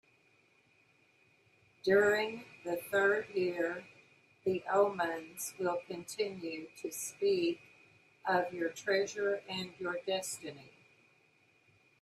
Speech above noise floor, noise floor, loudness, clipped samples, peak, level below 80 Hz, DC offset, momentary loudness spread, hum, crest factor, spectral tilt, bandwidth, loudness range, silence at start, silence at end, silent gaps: 35 dB; -69 dBFS; -35 LUFS; under 0.1%; -16 dBFS; -80 dBFS; under 0.1%; 13 LU; none; 20 dB; -3.5 dB/octave; 14.5 kHz; 4 LU; 1.85 s; 1.35 s; none